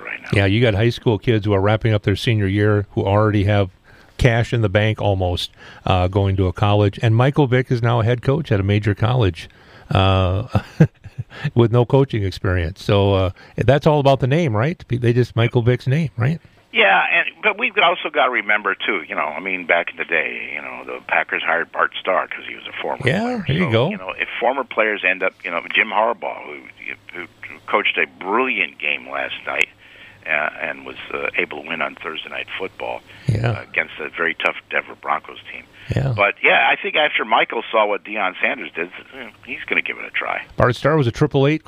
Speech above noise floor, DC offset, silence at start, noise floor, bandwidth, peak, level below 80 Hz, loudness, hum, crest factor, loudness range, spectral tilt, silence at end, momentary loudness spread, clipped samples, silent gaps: 25 dB; under 0.1%; 0 s; -44 dBFS; 11 kHz; 0 dBFS; -42 dBFS; -19 LUFS; none; 18 dB; 6 LU; -7 dB/octave; 0.1 s; 12 LU; under 0.1%; none